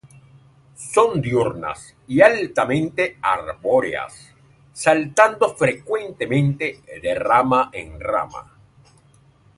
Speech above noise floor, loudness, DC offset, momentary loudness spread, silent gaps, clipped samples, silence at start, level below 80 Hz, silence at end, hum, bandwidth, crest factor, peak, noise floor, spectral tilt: 34 dB; -20 LUFS; under 0.1%; 14 LU; none; under 0.1%; 0.8 s; -52 dBFS; 1.15 s; none; 11.5 kHz; 20 dB; 0 dBFS; -54 dBFS; -5.5 dB/octave